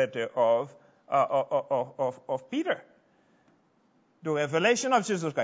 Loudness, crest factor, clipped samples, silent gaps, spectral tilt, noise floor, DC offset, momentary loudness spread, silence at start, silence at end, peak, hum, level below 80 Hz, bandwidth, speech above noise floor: -28 LUFS; 18 dB; under 0.1%; none; -4.5 dB/octave; -67 dBFS; under 0.1%; 9 LU; 0 s; 0 s; -10 dBFS; none; -82 dBFS; 8 kHz; 39 dB